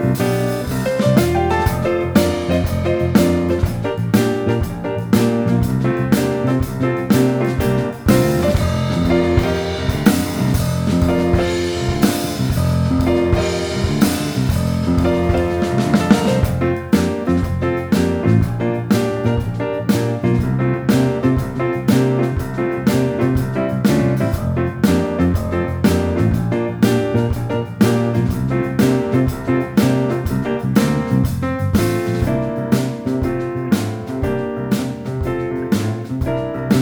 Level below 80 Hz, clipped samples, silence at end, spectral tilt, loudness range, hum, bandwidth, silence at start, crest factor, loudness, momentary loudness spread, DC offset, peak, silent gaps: -32 dBFS; under 0.1%; 0 s; -7 dB/octave; 2 LU; none; over 20 kHz; 0 s; 16 dB; -18 LUFS; 5 LU; under 0.1%; 0 dBFS; none